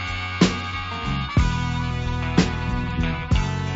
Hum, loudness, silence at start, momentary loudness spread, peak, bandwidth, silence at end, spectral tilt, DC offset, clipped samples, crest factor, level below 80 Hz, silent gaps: none; -23 LUFS; 0 s; 6 LU; -4 dBFS; 8 kHz; 0 s; -5.5 dB/octave; under 0.1%; under 0.1%; 18 dB; -30 dBFS; none